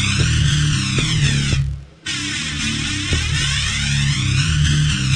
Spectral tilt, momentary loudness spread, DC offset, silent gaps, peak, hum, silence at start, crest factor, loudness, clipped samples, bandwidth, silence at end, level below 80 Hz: -3.5 dB/octave; 5 LU; under 0.1%; none; -4 dBFS; none; 0 s; 14 dB; -18 LUFS; under 0.1%; 10.5 kHz; 0 s; -28 dBFS